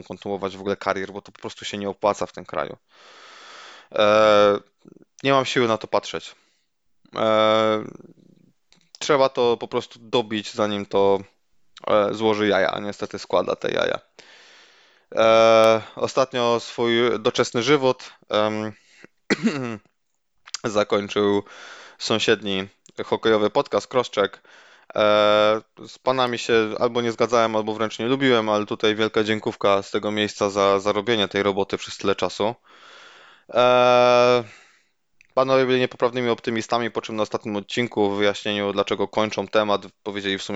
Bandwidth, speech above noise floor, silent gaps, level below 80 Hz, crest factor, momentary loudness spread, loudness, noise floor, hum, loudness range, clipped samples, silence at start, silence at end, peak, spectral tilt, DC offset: 8.2 kHz; 53 dB; none; -62 dBFS; 18 dB; 14 LU; -21 LUFS; -75 dBFS; none; 5 LU; under 0.1%; 0.1 s; 0 s; -4 dBFS; -4.5 dB/octave; under 0.1%